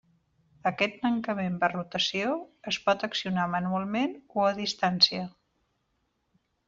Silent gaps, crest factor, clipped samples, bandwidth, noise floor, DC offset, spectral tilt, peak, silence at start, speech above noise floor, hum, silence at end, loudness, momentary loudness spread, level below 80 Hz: none; 24 dB; under 0.1%; 7.6 kHz; -76 dBFS; under 0.1%; -2.5 dB/octave; -6 dBFS; 0.65 s; 47 dB; none; 1.4 s; -28 LUFS; 10 LU; -68 dBFS